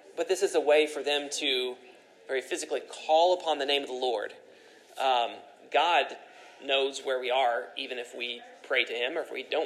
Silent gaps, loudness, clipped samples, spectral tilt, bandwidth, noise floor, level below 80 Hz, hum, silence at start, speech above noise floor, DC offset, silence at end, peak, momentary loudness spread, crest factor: none; -28 LUFS; under 0.1%; -0.5 dB/octave; 14 kHz; -54 dBFS; under -90 dBFS; none; 0.05 s; 26 dB; under 0.1%; 0 s; -10 dBFS; 12 LU; 20 dB